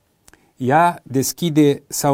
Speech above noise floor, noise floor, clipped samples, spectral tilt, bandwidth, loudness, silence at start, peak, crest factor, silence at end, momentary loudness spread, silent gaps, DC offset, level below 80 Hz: 37 dB; -54 dBFS; under 0.1%; -5 dB/octave; 16.5 kHz; -18 LUFS; 0.6 s; -2 dBFS; 18 dB; 0 s; 6 LU; none; under 0.1%; -56 dBFS